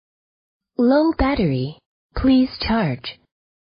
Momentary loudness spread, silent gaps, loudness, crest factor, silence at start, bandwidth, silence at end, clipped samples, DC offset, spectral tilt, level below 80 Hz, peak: 15 LU; 1.86-2.10 s; -19 LUFS; 16 dB; 0.8 s; 5.2 kHz; 0.65 s; under 0.1%; under 0.1%; -11.5 dB/octave; -36 dBFS; -6 dBFS